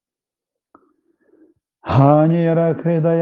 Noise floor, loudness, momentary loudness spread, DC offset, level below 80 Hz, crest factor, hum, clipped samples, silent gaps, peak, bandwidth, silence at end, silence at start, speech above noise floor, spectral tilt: -89 dBFS; -15 LUFS; 7 LU; under 0.1%; -56 dBFS; 18 dB; none; under 0.1%; none; 0 dBFS; 4.7 kHz; 0 s; 1.85 s; 75 dB; -11 dB/octave